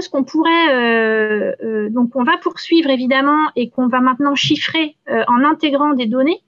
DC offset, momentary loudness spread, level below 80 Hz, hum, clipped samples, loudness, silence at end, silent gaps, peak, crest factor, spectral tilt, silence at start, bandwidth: under 0.1%; 6 LU; -68 dBFS; none; under 0.1%; -15 LUFS; 0.1 s; none; -4 dBFS; 10 dB; -4.5 dB/octave; 0 s; 7.4 kHz